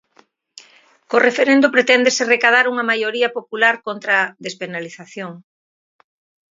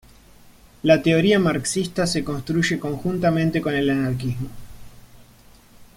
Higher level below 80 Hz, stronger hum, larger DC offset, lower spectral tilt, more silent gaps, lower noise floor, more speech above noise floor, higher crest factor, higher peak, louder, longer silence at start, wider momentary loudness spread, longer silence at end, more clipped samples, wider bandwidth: second, -74 dBFS vs -46 dBFS; neither; neither; second, -2.5 dB/octave vs -5.5 dB/octave; neither; first, -56 dBFS vs -50 dBFS; first, 39 dB vs 29 dB; about the same, 18 dB vs 20 dB; about the same, 0 dBFS vs -2 dBFS; first, -16 LUFS vs -21 LUFS; first, 1.1 s vs 0.85 s; first, 17 LU vs 9 LU; first, 1.1 s vs 0.1 s; neither; second, 7.8 kHz vs 16.5 kHz